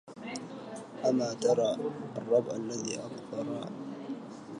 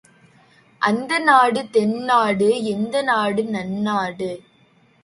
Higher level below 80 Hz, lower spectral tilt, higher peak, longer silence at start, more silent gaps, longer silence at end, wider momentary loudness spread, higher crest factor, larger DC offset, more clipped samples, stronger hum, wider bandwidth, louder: second, -76 dBFS vs -62 dBFS; about the same, -5 dB/octave vs -5 dB/octave; second, -14 dBFS vs -2 dBFS; second, 0.05 s vs 0.8 s; neither; second, 0 s vs 0.65 s; first, 13 LU vs 10 LU; about the same, 18 dB vs 18 dB; neither; neither; neither; about the same, 11 kHz vs 11.5 kHz; second, -33 LUFS vs -19 LUFS